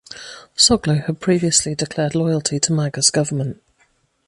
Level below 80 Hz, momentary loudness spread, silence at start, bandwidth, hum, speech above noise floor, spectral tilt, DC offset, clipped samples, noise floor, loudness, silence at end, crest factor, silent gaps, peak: -48 dBFS; 13 LU; 0.1 s; 11.5 kHz; none; 43 dB; -3.5 dB/octave; under 0.1%; under 0.1%; -61 dBFS; -17 LUFS; 0.75 s; 18 dB; none; -2 dBFS